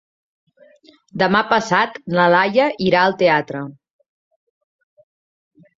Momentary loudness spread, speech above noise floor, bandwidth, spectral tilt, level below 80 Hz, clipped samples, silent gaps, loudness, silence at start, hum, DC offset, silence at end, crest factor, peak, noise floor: 15 LU; 34 dB; 7.6 kHz; -5.5 dB/octave; -60 dBFS; under 0.1%; none; -16 LUFS; 1.15 s; none; under 0.1%; 2.05 s; 18 dB; -2 dBFS; -51 dBFS